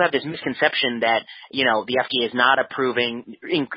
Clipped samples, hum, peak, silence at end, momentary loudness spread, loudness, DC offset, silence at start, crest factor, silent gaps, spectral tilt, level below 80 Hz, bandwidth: under 0.1%; none; -2 dBFS; 0 s; 8 LU; -21 LUFS; under 0.1%; 0 s; 18 dB; none; -9 dB/octave; -66 dBFS; 5.4 kHz